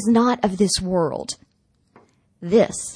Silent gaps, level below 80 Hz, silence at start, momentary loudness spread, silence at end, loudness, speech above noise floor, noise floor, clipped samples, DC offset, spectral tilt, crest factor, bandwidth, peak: none; -48 dBFS; 0 s; 15 LU; 0 s; -20 LUFS; 45 dB; -64 dBFS; under 0.1%; under 0.1%; -4.5 dB/octave; 18 dB; 10.5 kHz; -4 dBFS